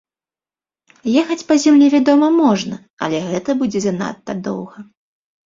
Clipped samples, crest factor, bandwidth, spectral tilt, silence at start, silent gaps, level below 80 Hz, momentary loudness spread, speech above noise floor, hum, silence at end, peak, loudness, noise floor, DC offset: under 0.1%; 16 dB; 7.6 kHz; -5.5 dB/octave; 1.05 s; 2.90-2.97 s; -60 dBFS; 15 LU; over 75 dB; none; 0.65 s; -2 dBFS; -16 LUFS; under -90 dBFS; under 0.1%